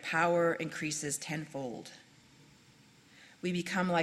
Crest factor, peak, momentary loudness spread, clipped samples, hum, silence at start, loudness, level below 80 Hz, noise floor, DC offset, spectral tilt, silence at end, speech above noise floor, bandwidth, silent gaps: 20 dB; -14 dBFS; 13 LU; under 0.1%; none; 0 s; -34 LUFS; -74 dBFS; -61 dBFS; under 0.1%; -4 dB/octave; 0 s; 28 dB; 14 kHz; none